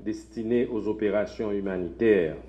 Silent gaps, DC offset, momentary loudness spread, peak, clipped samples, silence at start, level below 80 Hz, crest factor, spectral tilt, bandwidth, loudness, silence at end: none; under 0.1%; 9 LU; -10 dBFS; under 0.1%; 0 s; -50 dBFS; 18 dB; -7.5 dB/octave; 8.8 kHz; -27 LUFS; 0 s